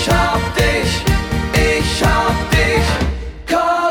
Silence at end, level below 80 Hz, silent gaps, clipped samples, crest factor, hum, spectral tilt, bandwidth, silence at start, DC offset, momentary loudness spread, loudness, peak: 0 s; -22 dBFS; none; under 0.1%; 14 dB; none; -4.5 dB/octave; 19 kHz; 0 s; 0.1%; 5 LU; -16 LUFS; -2 dBFS